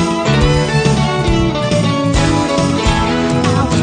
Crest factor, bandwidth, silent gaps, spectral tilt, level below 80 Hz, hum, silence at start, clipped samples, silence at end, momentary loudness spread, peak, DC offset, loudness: 12 dB; 9.8 kHz; none; -5.5 dB/octave; -24 dBFS; none; 0 s; under 0.1%; 0 s; 2 LU; 0 dBFS; under 0.1%; -14 LUFS